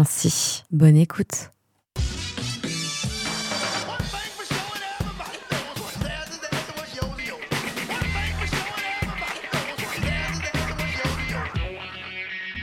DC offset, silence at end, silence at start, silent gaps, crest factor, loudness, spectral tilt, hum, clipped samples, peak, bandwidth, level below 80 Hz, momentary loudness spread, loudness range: under 0.1%; 0 s; 0 s; none; 22 dB; -26 LUFS; -4 dB/octave; none; under 0.1%; -4 dBFS; 18 kHz; -38 dBFS; 10 LU; 7 LU